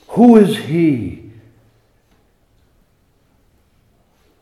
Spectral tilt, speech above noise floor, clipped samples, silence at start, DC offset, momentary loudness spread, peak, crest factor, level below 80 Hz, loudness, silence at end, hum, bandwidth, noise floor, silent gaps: -7.5 dB/octave; 47 dB; under 0.1%; 0.1 s; under 0.1%; 20 LU; 0 dBFS; 18 dB; -56 dBFS; -12 LUFS; 3.25 s; none; 13 kHz; -58 dBFS; none